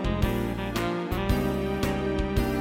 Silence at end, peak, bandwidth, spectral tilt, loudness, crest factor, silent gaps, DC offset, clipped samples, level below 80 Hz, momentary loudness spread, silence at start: 0 s; -10 dBFS; 17 kHz; -6.5 dB/octave; -28 LUFS; 16 dB; none; under 0.1%; under 0.1%; -34 dBFS; 3 LU; 0 s